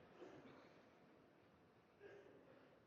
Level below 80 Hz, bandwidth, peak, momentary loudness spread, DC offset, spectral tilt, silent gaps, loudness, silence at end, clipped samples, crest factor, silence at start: under -90 dBFS; 6.8 kHz; -48 dBFS; 7 LU; under 0.1%; -4.5 dB/octave; none; -65 LUFS; 0 s; under 0.1%; 18 dB; 0 s